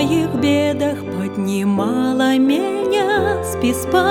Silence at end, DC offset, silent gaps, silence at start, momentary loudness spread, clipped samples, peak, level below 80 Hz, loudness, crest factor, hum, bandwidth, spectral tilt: 0 s; under 0.1%; none; 0 s; 5 LU; under 0.1%; -2 dBFS; -50 dBFS; -18 LUFS; 16 dB; none; 18.5 kHz; -5.5 dB/octave